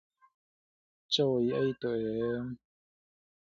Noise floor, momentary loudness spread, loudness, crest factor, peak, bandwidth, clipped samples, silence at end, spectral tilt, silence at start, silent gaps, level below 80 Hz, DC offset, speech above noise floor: under -90 dBFS; 11 LU; -31 LUFS; 20 dB; -14 dBFS; 7.8 kHz; under 0.1%; 1.05 s; -6 dB/octave; 1.1 s; none; -68 dBFS; under 0.1%; over 59 dB